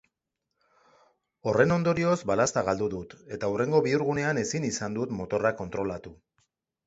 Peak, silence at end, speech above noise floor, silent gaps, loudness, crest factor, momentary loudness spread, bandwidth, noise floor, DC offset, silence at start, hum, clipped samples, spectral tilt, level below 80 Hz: -8 dBFS; 0.7 s; 57 dB; none; -27 LUFS; 22 dB; 10 LU; 8.2 kHz; -84 dBFS; under 0.1%; 1.45 s; none; under 0.1%; -5.5 dB/octave; -58 dBFS